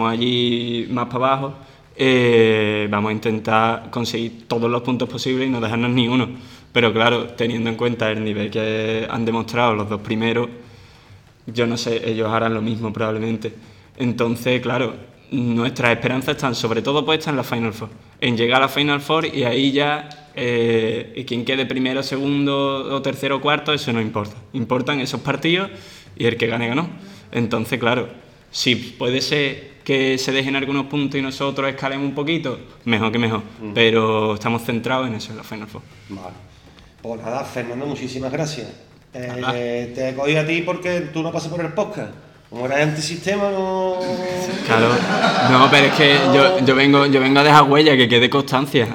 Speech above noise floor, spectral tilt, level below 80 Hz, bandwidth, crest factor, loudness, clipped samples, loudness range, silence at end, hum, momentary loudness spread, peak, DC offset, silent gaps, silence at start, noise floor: 28 dB; -5 dB/octave; -56 dBFS; 18 kHz; 20 dB; -19 LUFS; under 0.1%; 9 LU; 0 s; none; 14 LU; 0 dBFS; under 0.1%; none; 0 s; -47 dBFS